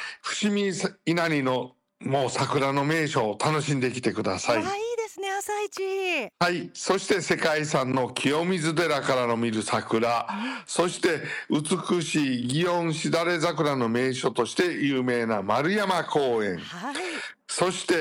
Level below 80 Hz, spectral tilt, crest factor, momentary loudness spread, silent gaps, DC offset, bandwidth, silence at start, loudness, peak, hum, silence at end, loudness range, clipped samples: -68 dBFS; -4.5 dB/octave; 14 dB; 6 LU; none; under 0.1%; 16.5 kHz; 0 s; -26 LUFS; -12 dBFS; none; 0 s; 2 LU; under 0.1%